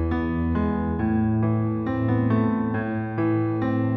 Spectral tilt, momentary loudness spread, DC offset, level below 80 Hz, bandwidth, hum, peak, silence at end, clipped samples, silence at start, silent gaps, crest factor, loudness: -11.5 dB/octave; 3 LU; under 0.1%; -38 dBFS; 4.3 kHz; none; -10 dBFS; 0 s; under 0.1%; 0 s; none; 12 dB; -24 LUFS